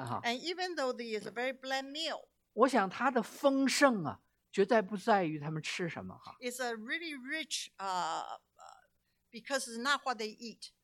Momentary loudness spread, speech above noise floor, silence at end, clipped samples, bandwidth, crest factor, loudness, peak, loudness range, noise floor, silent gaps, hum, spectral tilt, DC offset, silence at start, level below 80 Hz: 16 LU; 42 dB; 0.15 s; under 0.1%; 17 kHz; 22 dB; -34 LUFS; -12 dBFS; 8 LU; -76 dBFS; none; 60 Hz at -70 dBFS; -3.5 dB/octave; under 0.1%; 0 s; -82 dBFS